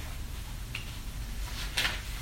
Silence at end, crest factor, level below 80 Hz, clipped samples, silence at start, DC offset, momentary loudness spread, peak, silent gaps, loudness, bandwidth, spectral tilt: 0 s; 24 dB; -38 dBFS; under 0.1%; 0 s; under 0.1%; 11 LU; -12 dBFS; none; -35 LUFS; 16.5 kHz; -2.5 dB/octave